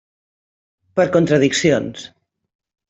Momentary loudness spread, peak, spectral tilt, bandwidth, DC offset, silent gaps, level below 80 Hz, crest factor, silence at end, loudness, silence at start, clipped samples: 14 LU; -2 dBFS; -5 dB/octave; 8.2 kHz; under 0.1%; none; -56 dBFS; 18 dB; 0.85 s; -16 LUFS; 0.95 s; under 0.1%